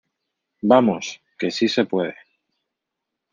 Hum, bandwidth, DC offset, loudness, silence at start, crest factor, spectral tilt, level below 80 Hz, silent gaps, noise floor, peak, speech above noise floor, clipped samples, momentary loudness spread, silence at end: none; 7.4 kHz; under 0.1%; -20 LUFS; 0.65 s; 22 dB; -5 dB/octave; -68 dBFS; none; -82 dBFS; -2 dBFS; 63 dB; under 0.1%; 13 LU; 1.2 s